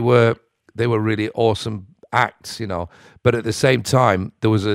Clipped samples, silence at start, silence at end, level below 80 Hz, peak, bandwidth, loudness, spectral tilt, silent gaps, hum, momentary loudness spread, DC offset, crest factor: under 0.1%; 0 s; 0 s; -50 dBFS; 0 dBFS; 15 kHz; -19 LUFS; -6 dB/octave; none; none; 14 LU; under 0.1%; 18 dB